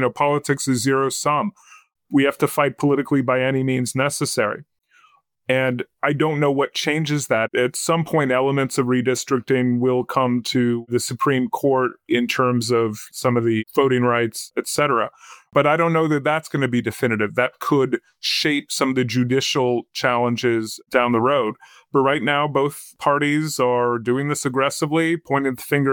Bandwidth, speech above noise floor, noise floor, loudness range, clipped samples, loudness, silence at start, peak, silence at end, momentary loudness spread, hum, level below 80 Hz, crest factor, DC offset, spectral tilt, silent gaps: 18.5 kHz; 37 dB; -57 dBFS; 2 LU; under 0.1%; -20 LUFS; 0 s; -4 dBFS; 0 s; 4 LU; none; -64 dBFS; 16 dB; under 0.1%; -5 dB/octave; none